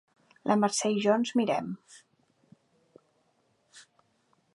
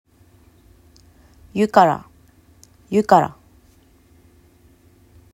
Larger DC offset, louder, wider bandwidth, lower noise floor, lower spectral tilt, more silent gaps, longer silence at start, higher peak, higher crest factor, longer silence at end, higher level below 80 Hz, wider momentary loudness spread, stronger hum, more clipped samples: neither; second, -28 LUFS vs -18 LUFS; second, 11.5 kHz vs 15.5 kHz; first, -71 dBFS vs -53 dBFS; second, -4.5 dB/octave vs -6.5 dB/octave; neither; second, 0.45 s vs 1.55 s; second, -10 dBFS vs 0 dBFS; about the same, 22 dB vs 22 dB; second, 0.75 s vs 2.05 s; second, -80 dBFS vs -56 dBFS; about the same, 13 LU vs 13 LU; neither; neither